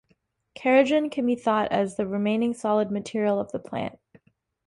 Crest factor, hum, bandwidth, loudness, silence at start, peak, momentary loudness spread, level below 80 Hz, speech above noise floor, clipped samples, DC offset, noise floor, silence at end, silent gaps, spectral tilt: 20 dB; none; 11.5 kHz; -25 LUFS; 0.6 s; -6 dBFS; 11 LU; -64 dBFS; 45 dB; under 0.1%; under 0.1%; -69 dBFS; 0.75 s; none; -6 dB/octave